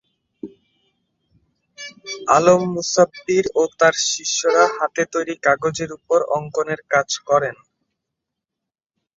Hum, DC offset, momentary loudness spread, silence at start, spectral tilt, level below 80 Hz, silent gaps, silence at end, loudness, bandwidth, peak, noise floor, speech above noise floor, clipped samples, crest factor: none; under 0.1%; 18 LU; 0.45 s; -3 dB/octave; -60 dBFS; none; 1.65 s; -18 LUFS; 7.8 kHz; -2 dBFS; -85 dBFS; 66 dB; under 0.1%; 20 dB